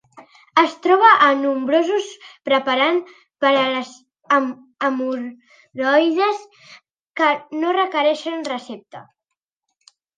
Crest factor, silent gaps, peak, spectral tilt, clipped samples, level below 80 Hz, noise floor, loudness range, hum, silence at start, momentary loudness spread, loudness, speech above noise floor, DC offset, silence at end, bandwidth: 20 dB; 7.01-7.14 s; 0 dBFS; -3.5 dB/octave; under 0.1%; -78 dBFS; -81 dBFS; 6 LU; none; 0.15 s; 17 LU; -18 LUFS; 63 dB; under 0.1%; 1.15 s; 9.6 kHz